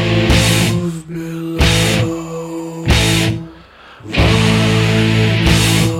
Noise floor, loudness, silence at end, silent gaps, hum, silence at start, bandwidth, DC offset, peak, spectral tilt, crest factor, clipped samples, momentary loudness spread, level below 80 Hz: -39 dBFS; -14 LUFS; 0 s; none; none; 0 s; 16.5 kHz; under 0.1%; 0 dBFS; -4.5 dB/octave; 14 dB; under 0.1%; 13 LU; -24 dBFS